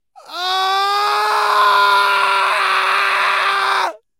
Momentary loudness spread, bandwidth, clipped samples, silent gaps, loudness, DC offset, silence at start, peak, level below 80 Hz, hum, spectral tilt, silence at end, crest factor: 6 LU; 16 kHz; under 0.1%; none; -14 LUFS; under 0.1%; 0.3 s; -2 dBFS; -76 dBFS; none; 1 dB/octave; 0.25 s; 14 dB